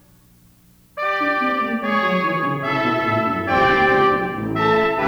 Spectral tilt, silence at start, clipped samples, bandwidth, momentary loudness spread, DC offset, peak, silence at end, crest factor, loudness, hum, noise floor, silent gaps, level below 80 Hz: -6.5 dB/octave; 0.95 s; under 0.1%; over 20 kHz; 7 LU; under 0.1%; -4 dBFS; 0 s; 14 dB; -19 LUFS; none; -52 dBFS; none; -48 dBFS